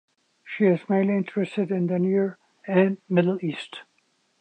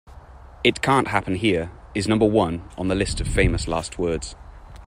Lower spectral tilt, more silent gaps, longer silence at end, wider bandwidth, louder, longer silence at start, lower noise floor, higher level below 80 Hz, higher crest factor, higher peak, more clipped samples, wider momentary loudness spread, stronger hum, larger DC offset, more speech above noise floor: first, -8.5 dB/octave vs -5.5 dB/octave; neither; first, 0.6 s vs 0 s; second, 8.8 kHz vs 15.5 kHz; about the same, -24 LUFS vs -22 LUFS; first, 0.45 s vs 0.1 s; first, -68 dBFS vs -43 dBFS; second, -78 dBFS vs -34 dBFS; about the same, 18 dB vs 20 dB; second, -6 dBFS vs -2 dBFS; neither; first, 15 LU vs 9 LU; neither; neither; first, 45 dB vs 22 dB